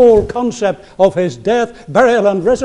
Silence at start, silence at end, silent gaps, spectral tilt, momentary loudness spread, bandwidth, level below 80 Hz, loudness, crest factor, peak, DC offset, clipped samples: 0 s; 0 s; none; -6 dB/octave; 8 LU; 10.5 kHz; -38 dBFS; -14 LUFS; 12 dB; 0 dBFS; under 0.1%; under 0.1%